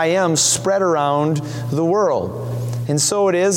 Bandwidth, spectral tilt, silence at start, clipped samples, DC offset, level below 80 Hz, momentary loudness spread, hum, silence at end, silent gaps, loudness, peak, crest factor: 17 kHz; -4 dB/octave; 0 s; under 0.1%; under 0.1%; -56 dBFS; 9 LU; none; 0 s; none; -18 LUFS; -4 dBFS; 14 dB